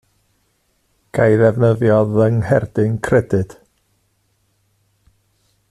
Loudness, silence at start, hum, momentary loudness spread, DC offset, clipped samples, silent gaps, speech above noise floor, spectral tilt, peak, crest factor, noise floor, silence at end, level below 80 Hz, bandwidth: -16 LUFS; 1.15 s; none; 8 LU; under 0.1%; under 0.1%; none; 49 dB; -8.5 dB/octave; -2 dBFS; 16 dB; -64 dBFS; 2.2 s; -48 dBFS; 11 kHz